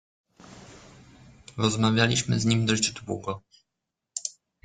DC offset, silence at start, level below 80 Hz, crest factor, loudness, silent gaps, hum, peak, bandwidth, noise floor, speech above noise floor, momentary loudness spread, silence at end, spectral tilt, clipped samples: under 0.1%; 0.5 s; -58 dBFS; 22 dB; -26 LUFS; none; none; -6 dBFS; 9.6 kHz; -85 dBFS; 60 dB; 17 LU; 0.35 s; -4 dB/octave; under 0.1%